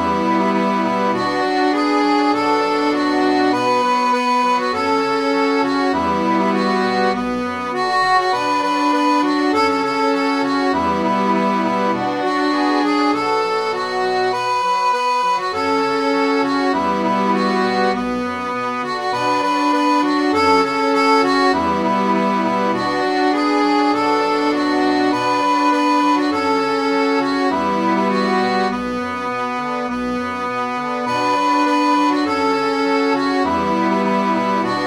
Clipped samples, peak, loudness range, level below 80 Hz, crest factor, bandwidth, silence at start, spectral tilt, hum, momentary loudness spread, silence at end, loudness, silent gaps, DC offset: under 0.1%; -2 dBFS; 2 LU; -52 dBFS; 14 dB; 12 kHz; 0 s; -5 dB/octave; none; 5 LU; 0 s; -17 LUFS; none; under 0.1%